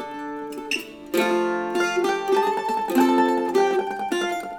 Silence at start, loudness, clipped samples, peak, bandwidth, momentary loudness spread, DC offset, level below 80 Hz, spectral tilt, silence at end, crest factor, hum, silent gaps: 0 s; -23 LUFS; under 0.1%; -6 dBFS; 19.5 kHz; 8 LU; under 0.1%; -64 dBFS; -3.5 dB/octave; 0 s; 16 dB; none; none